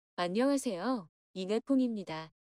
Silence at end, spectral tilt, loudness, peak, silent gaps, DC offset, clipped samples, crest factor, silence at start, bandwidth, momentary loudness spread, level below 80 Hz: 0.25 s; -5 dB/octave; -33 LUFS; -20 dBFS; 1.09-1.34 s; under 0.1%; under 0.1%; 14 dB; 0.2 s; 14.5 kHz; 12 LU; -78 dBFS